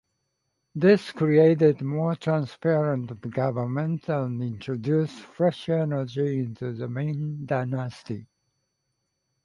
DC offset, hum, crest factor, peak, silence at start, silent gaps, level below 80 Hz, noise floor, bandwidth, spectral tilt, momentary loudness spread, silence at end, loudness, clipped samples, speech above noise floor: under 0.1%; none; 18 dB; -6 dBFS; 0.75 s; none; -66 dBFS; -78 dBFS; 11 kHz; -8.5 dB/octave; 12 LU; 1.2 s; -25 LUFS; under 0.1%; 53 dB